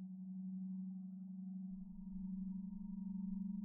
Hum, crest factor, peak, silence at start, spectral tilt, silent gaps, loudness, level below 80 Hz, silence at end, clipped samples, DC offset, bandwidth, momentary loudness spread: none; 10 dB; -36 dBFS; 0 s; -16 dB/octave; none; -48 LUFS; -64 dBFS; 0 s; under 0.1%; under 0.1%; 1.1 kHz; 5 LU